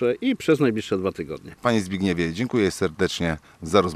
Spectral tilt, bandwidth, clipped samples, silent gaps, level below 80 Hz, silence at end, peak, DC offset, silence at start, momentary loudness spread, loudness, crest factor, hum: -5.5 dB/octave; 14.5 kHz; under 0.1%; none; -54 dBFS; 0 s; -4 dBFS; under 0.1%; 0 s; 7 LU; -24 LUFS; 18 dB; none